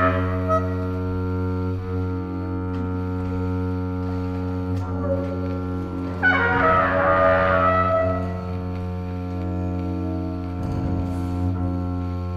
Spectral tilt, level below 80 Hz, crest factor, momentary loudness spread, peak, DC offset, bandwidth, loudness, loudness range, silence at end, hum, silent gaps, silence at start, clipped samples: -8.5 dB/octave; -42 dBFS; 16 dB; 10 LU; -6 dBFS; under 0.1%; 6.2 kHz; -23 LUFS; 7 LU; 0 s; none; none; 0 s; under 0.1%